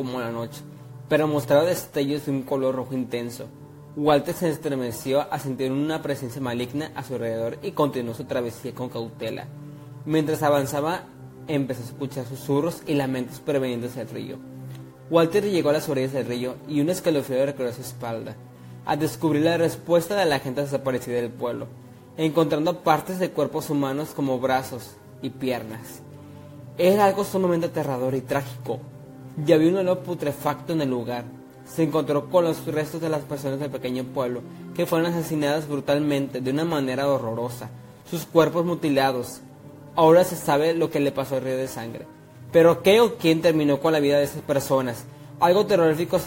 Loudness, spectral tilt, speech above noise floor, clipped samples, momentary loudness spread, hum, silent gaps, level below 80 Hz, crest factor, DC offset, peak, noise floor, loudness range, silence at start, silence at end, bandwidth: -24 LUFS; -6 dB/octave; 20 dB; under 0.1%; 17 LU; none; none; -60 dBFS; 22 dB; under 0.1%; -2 dBFS; -44 dBFS; 6 LU; 0 s; 0 s; 16.5 kHz